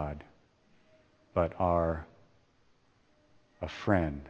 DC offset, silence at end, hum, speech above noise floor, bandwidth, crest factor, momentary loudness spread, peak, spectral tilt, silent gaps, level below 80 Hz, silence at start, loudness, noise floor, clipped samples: under 0.1%; 0 s; none; 37 dB; 7.6 kHz; 24 dB; 15 LU; -10 dBFS; -8.5 dB/octave; none; -50 dBFS; 0 s; -32 LUFS; -67 dBFS; under 0.1%